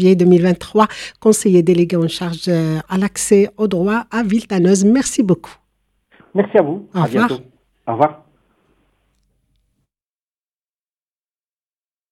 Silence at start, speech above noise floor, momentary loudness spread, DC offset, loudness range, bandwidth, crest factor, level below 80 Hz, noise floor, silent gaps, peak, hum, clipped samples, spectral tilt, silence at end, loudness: 0 s; over 75 dB; 8 LU; under 0.1%; 9 LU; 14 kHz; 16 dB; -52 dBFS; under -90 dBFS; none; 0 dBFS; none; under 0.1%; -6 dB/octave; 3.95 s; -16 LUFS